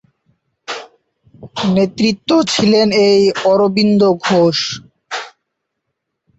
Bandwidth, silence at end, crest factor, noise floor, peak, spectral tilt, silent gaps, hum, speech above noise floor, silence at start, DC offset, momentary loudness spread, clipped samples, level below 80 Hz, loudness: 8.2 kHz; 1.1 s; 14 dB; -74 dBFS; -2 dBFS; -5 dB/octave; none; none; 62 dB; 0.7 s; under 0.1%; 17 LU; under 0.1%; -54 dBFS; -13 LUFS